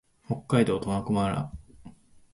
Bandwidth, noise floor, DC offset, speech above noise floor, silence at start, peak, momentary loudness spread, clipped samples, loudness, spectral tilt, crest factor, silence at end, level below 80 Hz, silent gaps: 11.5 kHz; -51 dBFS; under 0.1%; 25 dB; 0.3 s; -10 dBFS; 13 LU; under 0.1%; -27 LUFS; -7 dB/octave; 20 dB; 0.45 s; -52 dBFS; none